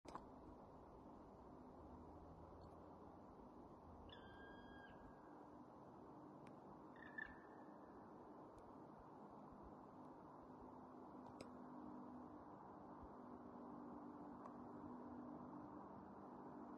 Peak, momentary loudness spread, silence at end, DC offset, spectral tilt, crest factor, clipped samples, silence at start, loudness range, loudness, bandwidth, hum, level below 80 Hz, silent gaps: -38 dBFS; 6 LU; 0 s; under 0.1%; -5.5 dB/octave; 22 dB; under 0.1%; 0.05 s; 4 LU; -60 LUFS; 6.6 kHz; none; -76 dBFS; none